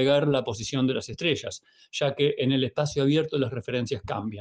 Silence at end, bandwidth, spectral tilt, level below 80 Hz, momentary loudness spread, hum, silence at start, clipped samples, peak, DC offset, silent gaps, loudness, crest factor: 0 s; 9.6 kHz; -5.5 dB/octave; -60 dBFS; 7 LU; none; 0 s; under 0.1%; -10 dBFS; under 0.1%; none; -26 LUFS; 16 dB